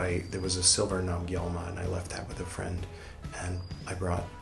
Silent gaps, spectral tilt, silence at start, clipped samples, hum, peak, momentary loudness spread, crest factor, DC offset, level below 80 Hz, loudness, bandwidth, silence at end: none; -3.5 dB/octave; 0 s; under 0.1%; none; -10 dBFS; 15 LU; 22 dB; under 0.1%; -48 dBFS; -31 LUFS; 12 kHz; 0 s